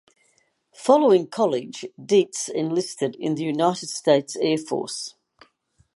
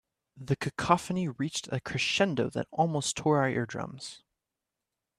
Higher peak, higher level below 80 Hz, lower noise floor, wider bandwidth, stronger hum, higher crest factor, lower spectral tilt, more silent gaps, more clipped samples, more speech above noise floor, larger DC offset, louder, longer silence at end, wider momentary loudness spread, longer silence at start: first, -2 dBFS vs -8 dBFS; second, -76 dBFS vs -62 dBFS; second, -66 dBFS vs -88 dBFS; second, 11.5 kHz vs 13.5 kHz; neither; about the same, 20 dB vs 24 dB; about the same, -4.5 dB/octave vs -4.5 dB/octave; neither; neither; second, 44 dB vs 58 dB; neither; first, -22 LUFS vs -30 LUFS; second, 0.85 s vs 1 s; about the same, 12 LU vs 12 LU; first, 0.8 s vs 0.35 s